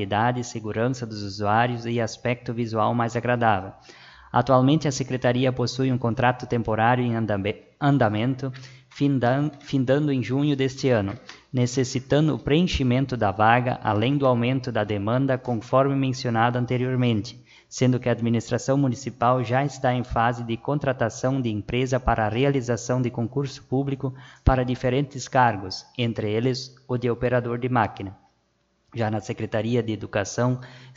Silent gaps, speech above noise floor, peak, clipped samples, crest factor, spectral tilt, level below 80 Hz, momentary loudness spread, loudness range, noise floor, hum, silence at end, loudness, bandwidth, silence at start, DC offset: none; 45 dB; -2 dBFS; under 0.1%; 22 dB; -6.5 dB/octave; -44 dBFS; 8 LU; 3 LU; -68 dBFS; none; 0.05 s; -24 LUFS; 7.8 kHz; 0 s; under 0.1%